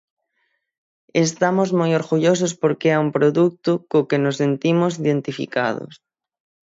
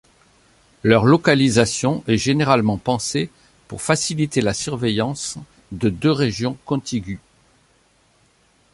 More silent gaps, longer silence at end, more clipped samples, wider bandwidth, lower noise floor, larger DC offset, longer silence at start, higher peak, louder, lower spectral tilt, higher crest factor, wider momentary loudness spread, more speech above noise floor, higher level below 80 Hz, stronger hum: neither; second, 0.8 s vs 1.55 s; neither; second, 7.8 kHz vs 11.5 kHz; first, -71 dBFS vs -59 dBFS; neither; first, 1.15 s vs 0.85 s; about the same, -4 dBFS vs -2 dBFS; about the same, -19 LUFS vs -19 LUFS; about the same, -6 dB/octave vs -5 dB/octave; about the same, 16 dB vs 20 dB; second, 6 LU vs 14 LU; first, 52 dB vs 40 dB; second, -66 dBFS vs -48 dBFS; neither